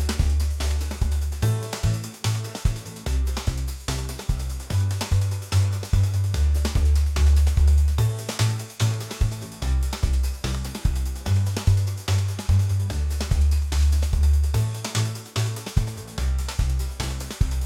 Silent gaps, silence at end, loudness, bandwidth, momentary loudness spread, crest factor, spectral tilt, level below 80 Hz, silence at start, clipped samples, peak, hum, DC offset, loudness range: none; 0 s; -24 LUFS; 16 kHz; 8 LU; 16 dB; -5 dB/octave; -26 dBFS; 0 s; under 0.1%; -6 dBFS; none; under 0.1%; 5 LU